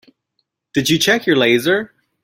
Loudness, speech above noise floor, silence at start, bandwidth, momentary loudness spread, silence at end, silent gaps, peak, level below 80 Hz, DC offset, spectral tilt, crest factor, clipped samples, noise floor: -15 LUFS; 56 dB; 0.75 s; 16.5 kHz; 8 LU; 0.35 s; none; -2 dBFS; -56 dBFS; under 0.1%; -4 dB/octave; 16 dB; under 0.1%; -71 dBFS